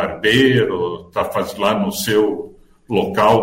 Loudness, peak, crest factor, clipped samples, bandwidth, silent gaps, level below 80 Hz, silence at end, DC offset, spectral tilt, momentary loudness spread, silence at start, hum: -17 LUFS; -2 dBFS; 14 dB; under 0.1%; 16.5 kHz; none; -50 dBFS; 0 s; under 0.1%; -5 dB/octave; 10 LU; 0 s; none